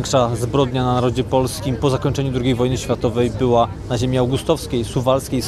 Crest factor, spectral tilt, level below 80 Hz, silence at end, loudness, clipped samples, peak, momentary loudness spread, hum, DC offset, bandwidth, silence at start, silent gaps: 16 dB; -6 dB/octave; -36 dBFS; 0 s; -19 LUFS; under 0.1%; -2 dBFS; 3 LU; none; under 0.1%; 14.5 kHz; 0 s; none